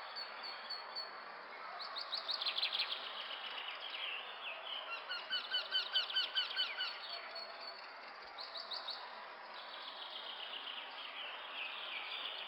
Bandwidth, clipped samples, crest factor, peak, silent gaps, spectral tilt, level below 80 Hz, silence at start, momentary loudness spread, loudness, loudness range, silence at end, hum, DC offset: 17 kHz; under 0.1%; 20 dB; -24 dBFS; none; 0 dB/octave; under -90 dBFS; 0 s; 13 LU; -41 LUFS; 8 LU; 0 s; none; under 0.1%